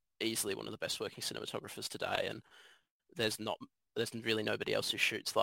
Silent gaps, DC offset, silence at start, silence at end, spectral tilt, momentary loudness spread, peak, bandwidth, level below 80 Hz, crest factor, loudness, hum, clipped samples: 2.91-3.00 s; under 0.1%; 0.2 s; 0 s; -2.5 dB/octave; 10 LU; -16 dBFS; 16.5 kHz; -74 dBFS; 24 dB; -37 LUFS; none; under 0.1%